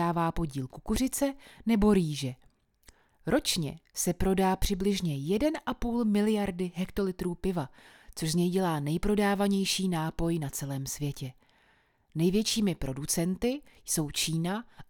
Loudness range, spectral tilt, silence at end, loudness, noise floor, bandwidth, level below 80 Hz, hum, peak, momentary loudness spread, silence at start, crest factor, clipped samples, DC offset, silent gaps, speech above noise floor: 2 LU; -5 dB/octave; 0.05 s; -30 LUFS; -67 dBFS; 20 kHz; -44 dBFS; none; -12 dBFS; 9 LU; 0 s; 18 dB; under 0.1%; under 0.1%; none; 37 dB